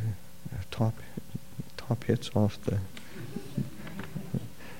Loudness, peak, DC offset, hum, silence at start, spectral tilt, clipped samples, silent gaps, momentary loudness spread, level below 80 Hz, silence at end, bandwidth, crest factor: -34 LUFS; -10 dBFS; 0.9%; none; 0 s; -7 dB/octave; under 0.1%; none; 13 LU; -56 dBFS; 0 s; 16.5 kHz; 24 dB